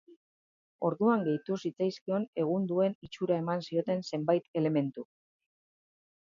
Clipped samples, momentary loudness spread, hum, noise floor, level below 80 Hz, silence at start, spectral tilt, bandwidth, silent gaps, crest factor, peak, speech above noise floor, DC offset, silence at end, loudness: under 0.1%; 7 LU; none; under -90 dBFS; -78 dBFS; 0.8 s; -7.5 dB/octave; 7.4 kHz; 2.01-2.06 s, 2.28-2.33 s, 2.95-3.02 s, 4.48-4.54 s; 18 dB; -14 dBFS; over 59 dB; under 0.1%; 1.35 s; -31 LUFS